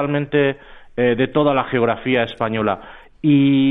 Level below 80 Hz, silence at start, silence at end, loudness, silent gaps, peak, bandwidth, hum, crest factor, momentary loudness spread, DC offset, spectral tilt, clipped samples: -48 dBFS; 0 s; 0 s; -18 LUFS; none; -4 dBFS; 4 kHz; none; 14 dB; 8 LU; under 0.1%; -9.5 dB/octave; under 0.1%